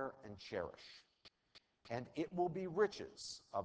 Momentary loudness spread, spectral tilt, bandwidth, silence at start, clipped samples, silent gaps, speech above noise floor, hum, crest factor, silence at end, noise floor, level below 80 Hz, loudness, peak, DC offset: 20 LU; -5 dB/octave; 8 kHz; 0 s; under 0.1%; none; 27 dB; none; 20 dB; 0 s; -70 dBFS; -72 dBFS; -43 LUFS; -24 dBFS; under 0.1%